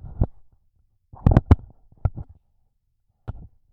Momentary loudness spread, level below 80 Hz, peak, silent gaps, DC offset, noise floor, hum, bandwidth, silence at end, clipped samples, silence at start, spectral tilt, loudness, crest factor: 24 LU; -30 dBFS; -2 dBFS; none; under 0.1%; -69 dBFS; none; 5.2 kHz; 0.4 s; under 0.1%; 0.2 s; -10.5 dB/octave; -23 LUFS; 22 dB